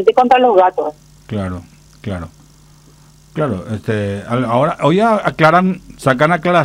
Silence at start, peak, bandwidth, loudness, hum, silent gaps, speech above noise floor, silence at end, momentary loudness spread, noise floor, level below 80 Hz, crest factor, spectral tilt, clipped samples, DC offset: 0 s; 0 dBFS; 15.5 kHz; -14 LUFS; none; none; 31 dB; 0 s; 16 LU; -45 dBFS; -46 dBFS; 14 dB; -7 dB/octave; under 0.1%; under 0.1%